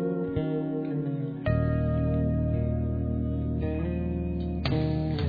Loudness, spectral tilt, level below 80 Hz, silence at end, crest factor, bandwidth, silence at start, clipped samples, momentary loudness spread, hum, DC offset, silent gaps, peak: -29 LUFS; -10.5 dB/octave; -36 dBFS; 0 s; 14 dB; 5 kHz; 0 s; under 0.1%; 4 LU; none; under 0.1%; none; -12 dBFS